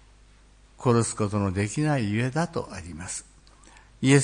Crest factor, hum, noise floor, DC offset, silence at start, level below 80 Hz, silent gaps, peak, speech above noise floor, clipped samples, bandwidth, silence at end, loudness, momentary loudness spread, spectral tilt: 20 dB; 50 Hz at -45 dBFS; -55 dBFS; under 0.1%; 0.8 s; -54 dBFS; none; -6 dBFS; 29 dB; under 0.1%; 10.5 kHz; 0 s; -27 LUFS; 12 LU; -5.5 dB/octave